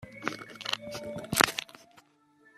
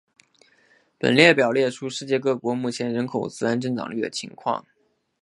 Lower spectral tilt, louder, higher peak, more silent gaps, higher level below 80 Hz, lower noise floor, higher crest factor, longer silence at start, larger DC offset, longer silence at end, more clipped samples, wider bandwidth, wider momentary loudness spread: second, -2 dB/octave vs -5 dB/octave; second, -31 LUFS vs -22 LUFS; about the same, 0 dBFS vs 0 dBFS; neither; about the same, -64 dBFS vs -68 dBFS; first, -64 dBFS vs -60 dBFS; first, 34 dB vs 24 dB; second, 0 s vs 1.05 s; neither; about the same, 0.55 s vs 0.6 s; neither; first, 15.5 kHz vs 11.5 kHz; about the same, 14 LU vs 13 LU